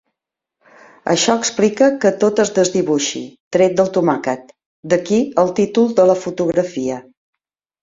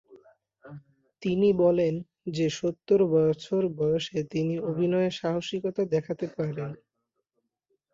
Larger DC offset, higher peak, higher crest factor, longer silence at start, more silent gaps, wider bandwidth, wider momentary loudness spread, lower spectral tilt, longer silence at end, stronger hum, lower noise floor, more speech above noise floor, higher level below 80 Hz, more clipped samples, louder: neither; first, -2 dBFS vs -12 dBFS; about the same, 16 dB vs 16 dB; first, 1.05 s vs 0.1 s; first, 3.40-3.51 s, 4.66-4.83 s vs none; about the same, 7.8 kHz vs 7.8 kHz; about the same, 10 LU vs 10 LU; second, -4.5 dB/octave vs -7 dB/octave; second, 0.8 s vs 1.2 s; neither; about the same, -82 dBFS vs -81 dBFS; first, 67 dB vs 55 dB; first, -58 dBFS vs -64 dBFS; neither; first, -16 LUFS vs -27 LUFS